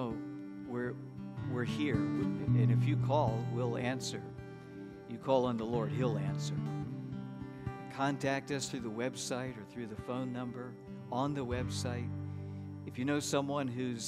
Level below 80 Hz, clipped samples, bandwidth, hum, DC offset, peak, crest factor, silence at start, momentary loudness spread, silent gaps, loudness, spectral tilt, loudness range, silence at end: -60 dBFS; under 0.1%; 13.5 kHz; none; under 0.1%; -16 dBFS; 20 dB; 0 s; 14 LU; none; -36 LUFS; -6 dB/octave; 6 LU; 0 s